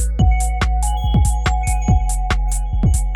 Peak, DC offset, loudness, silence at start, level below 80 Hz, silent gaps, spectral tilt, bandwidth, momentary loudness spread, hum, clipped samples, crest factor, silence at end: -4 dBFS; under 0.1%; -19 LUFS; 0 s; -18 dBFS; none; -5 dB/octave; 17 kHz; 4 LU; none; under 0.1%; 12 dB; 0 s